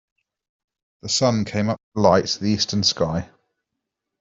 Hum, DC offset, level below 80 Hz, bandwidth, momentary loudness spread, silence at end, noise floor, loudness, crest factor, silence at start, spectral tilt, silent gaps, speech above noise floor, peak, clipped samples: none; under 0.1%; -54 dBFS; 7.8 kHz; 10 LU; 0.95 s; -82 dBFS; -20 LUFS; 22 dB; 1.05 s; -4.5 dB/octave; 1.83-1.92 s; 61 dB; -2 dBFS; under 0.1%